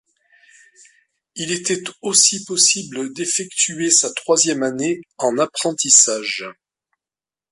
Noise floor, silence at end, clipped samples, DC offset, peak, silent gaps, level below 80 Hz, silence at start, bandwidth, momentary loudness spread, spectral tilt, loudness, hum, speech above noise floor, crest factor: under -90 dBFS; 1 s; under 0.1%; under 0.1%; 0 dBFS; none; -70 dBFS; 1.35 s; 11.5 kHz; 13 LU; -1 dB/octave; -16 LUFS; none; over 71 dB; 20 dB